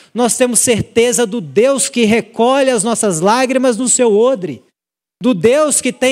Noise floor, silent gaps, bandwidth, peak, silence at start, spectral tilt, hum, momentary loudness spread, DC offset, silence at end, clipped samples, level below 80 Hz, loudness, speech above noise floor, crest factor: -82 dBFS; none; 16 kHz; 0 dBFS; 0.15 s; -3.5 dB/octave; none; 5 LU; under 0.1%; 0 s; under 0.1%; -54 dBFS; -13 LUFS; 70 dB; 14 dB